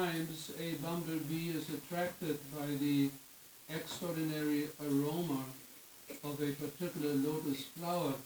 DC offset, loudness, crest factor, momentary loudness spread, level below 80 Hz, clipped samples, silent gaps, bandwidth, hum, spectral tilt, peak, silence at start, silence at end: under 0.1%; -38 LUFS; 16 dB; 11 LU; -76 dBFS; under 0.1%; none; over 20 kHz; none; -5.5 dB/octave; -22 dBFS; 0 s; 0 s